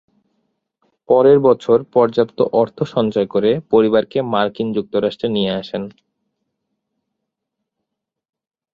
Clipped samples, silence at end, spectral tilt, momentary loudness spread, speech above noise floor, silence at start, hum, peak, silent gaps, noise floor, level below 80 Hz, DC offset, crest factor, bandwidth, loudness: under 0.1%; 2.85 s; -8 dB/octave; 8 LU; 65 dB; 1.1 s; none; -2 dBFS; none; -81 dBFS; -58 dBFS; under 0.1%; 18 dB; 7.2 kHz; -16 LUFS